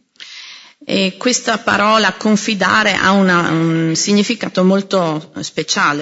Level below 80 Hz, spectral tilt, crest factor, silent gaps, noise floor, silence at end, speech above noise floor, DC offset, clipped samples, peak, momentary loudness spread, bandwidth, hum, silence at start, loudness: -56 dBFS; -4 dB/octave; 14 dB; none; -37 dBFS; 0 s; 23 dB; under 0.1%; under 0.1%; -2 dBFS; 15 LU; 8 kHz; none; 0.2 s; -14 LUFS